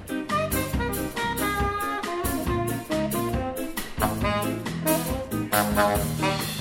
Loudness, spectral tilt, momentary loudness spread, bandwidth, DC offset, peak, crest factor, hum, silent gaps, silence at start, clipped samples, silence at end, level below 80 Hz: -26 LUFS; -4.5 dB/octave; 6 LU; 17 kHz; under 0.1%; -8 dBFS; 18 dB; none; none; 0 s; under 0.1%; 0 s; -38 dBFS